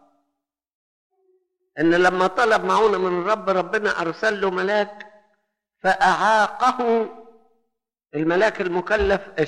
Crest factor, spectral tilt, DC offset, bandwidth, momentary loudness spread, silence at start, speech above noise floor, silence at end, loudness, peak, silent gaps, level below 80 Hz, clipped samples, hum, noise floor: 16 dB; -5 dB/octave; under 0.1%; 11.5 kHz; 7 LU; 1.75 s; 60 dB; 0 s; -20 LUFS; -6 dBFS; none; -48 dBFS; under 0.1%; none; -80 dBFS